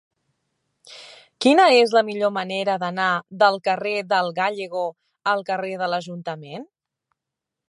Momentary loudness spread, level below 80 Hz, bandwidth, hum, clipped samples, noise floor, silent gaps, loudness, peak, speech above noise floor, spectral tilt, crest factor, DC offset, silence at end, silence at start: 18 LU; -80 dBFS; 11.5 kHz; none; under 0.1%; -85 dBFS; none; -21 LUFS; -4 dBFS; 64 dB; -4.5 dB/octave; 20 dB; under 0.1%; 1.05 s; 0.85 s